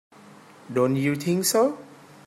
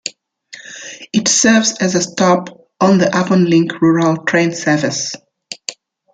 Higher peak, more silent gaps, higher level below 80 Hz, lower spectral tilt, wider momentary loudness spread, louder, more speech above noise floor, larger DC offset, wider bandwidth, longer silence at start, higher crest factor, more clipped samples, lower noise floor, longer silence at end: second, -8 dBFS vs 0 dBFS; neither; second, -70 dBFS vs -58 dBFS; about the same, -5 dB/octave vs -4 dB/octave; second, 8 LU vs 19 LU; second, -23 LUFS vs -14 LUFS; about the same, 26 dB vs 27 dB; neither; first, 16 kHz vs 9.4 kHz; first, 0.7 s vs 0.05 s; about the same, 18 dB vs 14 dB; neither; first, -49 dBFS vs -40 dBFS; about the same, 0.35 s vs 0.4 s